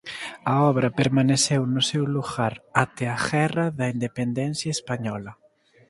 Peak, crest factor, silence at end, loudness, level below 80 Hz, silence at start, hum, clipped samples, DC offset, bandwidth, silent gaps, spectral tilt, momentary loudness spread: -2 dBFS; 22 dB; 0.55 s; -24 LUFS; -58 dBFS; 0.05 s; none; under 0.1%; under 0.1%; 11.5 kHz; none; -5 dB/octave; 9 LU